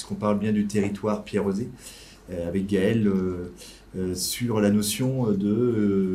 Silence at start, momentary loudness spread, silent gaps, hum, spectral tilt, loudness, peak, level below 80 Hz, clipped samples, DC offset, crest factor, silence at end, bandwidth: 0 s; 15 LU; none; none; -6 dB/octave; -25 LUFS; -8 dBFS; -52 dBFS; under 0.1%; under 0.1%; 16 dB; 0 s; 16 kHz